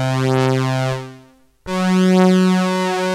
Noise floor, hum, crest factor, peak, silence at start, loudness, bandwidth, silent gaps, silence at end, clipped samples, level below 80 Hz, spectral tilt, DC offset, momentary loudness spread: -48 dBFS; none; 16 dB; 0 dBFS; 0 s; -16 LUFS; 13 kHz; none; 0 s; under 0.1%; -52 dBFS; -6.5 dB/octave; under 0.1%; 12 LU